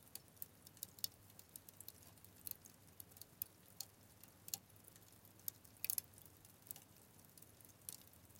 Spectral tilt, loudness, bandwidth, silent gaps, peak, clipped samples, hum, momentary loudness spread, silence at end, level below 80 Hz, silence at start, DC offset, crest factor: -1 dB/octave; -50 LUFS; 17 kHz; none; -16 dBFS; under 0.1%; none; 17 LU; 0 s; -82 dBFS; 0 s; under 0.1%; 38 dB